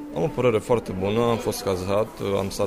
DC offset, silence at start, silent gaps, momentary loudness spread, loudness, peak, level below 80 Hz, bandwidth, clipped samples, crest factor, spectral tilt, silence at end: under 0.1%; 0 s; none; 4 LU; -24 LUFS; -6 dBFS; -46 dBFS; 16 kHz; under 0.1%; 16 dB; -6 dB/octave; 0 s